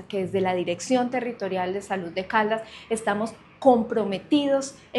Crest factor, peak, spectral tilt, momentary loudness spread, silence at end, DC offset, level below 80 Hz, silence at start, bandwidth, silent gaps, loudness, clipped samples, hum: 20 dB; -6 dBFS; -5 dB/octave; 9 LU; 0 s; under 0.1%; -62 dBFS; 0 s; 12 kHz; none; -25 LUFS; under 0.1%; none